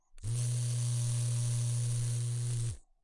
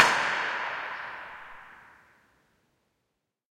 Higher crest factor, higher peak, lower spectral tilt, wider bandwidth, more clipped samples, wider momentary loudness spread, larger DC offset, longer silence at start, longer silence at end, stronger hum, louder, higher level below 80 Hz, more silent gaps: second, 10 dB vs 30 dB; second, -24 dBFS vs -2 dBFS; first, -5 dB/octave vs -1 dB/octave; second, 11.5 kHz vs 16.5 kHz; neither; second, 4 LU vs 22 LU; neither; first, 0.15 s vs 0 s; second, 0.2 s vs 1.7 s; neither; second, -34 LUFS vs -29 LUFS; first, -50 dBFS vs -72 dBFS; neither